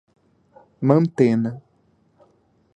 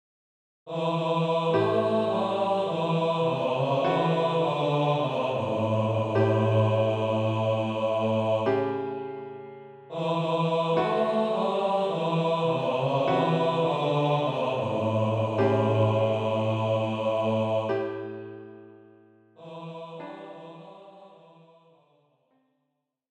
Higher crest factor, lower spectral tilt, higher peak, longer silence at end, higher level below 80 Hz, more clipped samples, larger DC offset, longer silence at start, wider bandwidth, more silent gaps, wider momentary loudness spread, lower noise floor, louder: first, 22 dB vs 16 dB; first, -9.5 dB/octave vs -7.5 dB/octave; first, -2 dBFS vs -12 dBFS; second, 1.2 s vs 2.05 s; first, -64 dBFS vs -70 dBFS; neither; neither; first, 0.8 s vs 0.65 s; about the same, 9 kHz vs 9 kHz; neither; second, 11 LU vs 16 LU; second, -61 dBFS vs -79 dBFS; first, -20 LUFS vs -26 LUFS